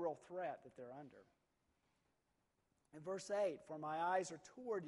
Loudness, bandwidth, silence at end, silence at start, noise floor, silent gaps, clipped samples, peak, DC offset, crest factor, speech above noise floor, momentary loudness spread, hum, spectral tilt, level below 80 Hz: -45 LUFS; 11.5 kHz; 0 s; 0 s; -85 dBFS; none; under 0.1%; -28 dBFS; under 0.1%; 20 dB; 39 dB; 16 LU; none; -4.5 dB/octave; -88 dBFS